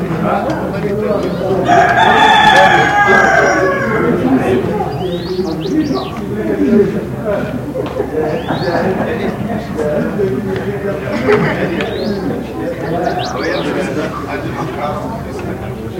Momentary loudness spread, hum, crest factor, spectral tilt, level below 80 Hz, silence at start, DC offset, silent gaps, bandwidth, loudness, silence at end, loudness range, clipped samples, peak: 12 LU; none; 14 dB; -5.5 dB/octave; -36 dBFS; 0 s; under 0.1%; none; 17 kHz; -14 LUFS; 0 s; 9 LU; under 0.1%; 0 dBFS